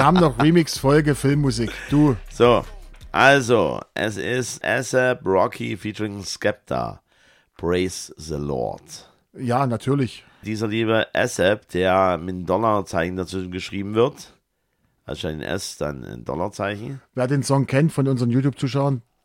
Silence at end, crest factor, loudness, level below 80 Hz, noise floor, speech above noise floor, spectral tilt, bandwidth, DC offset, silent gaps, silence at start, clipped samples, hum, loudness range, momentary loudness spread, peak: 0.25 s; 20 dB; -21 LUFS; -44 dBFS; -69 dBFS; 48 dB; -5.5 dB/octave; 16 kHz; under 0.1%; none; 0 s; under 0.1%; none; 8 LU; 12 LU; -2 dBFS